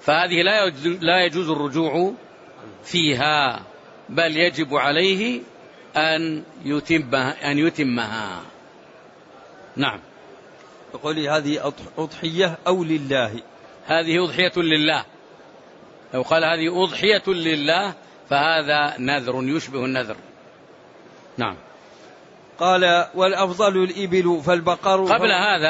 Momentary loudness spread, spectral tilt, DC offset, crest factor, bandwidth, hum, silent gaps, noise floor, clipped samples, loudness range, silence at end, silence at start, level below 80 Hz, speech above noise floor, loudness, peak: 12 LU; -4.5 dB/octave; under 0.1%; 18 dB; 8 kHz; none; none; -47 dBFS; under 0.1%; 7 LU; 0 s; 0 s; -62 dBFS; 27 dB; -20 LUFS; -4 dBFS